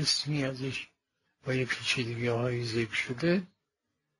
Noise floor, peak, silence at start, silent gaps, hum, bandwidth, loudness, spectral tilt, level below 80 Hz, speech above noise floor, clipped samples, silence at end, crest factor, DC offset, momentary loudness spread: -83 dBFS; -16 dBFS; 0 s; none; none; 11.5 kHz; -31 LUFS; -4.5 dB/octave; -64 dBFS; 53 dB; under 0.1%; 0.75 s; 18 dB; under 0.1%; 10 LU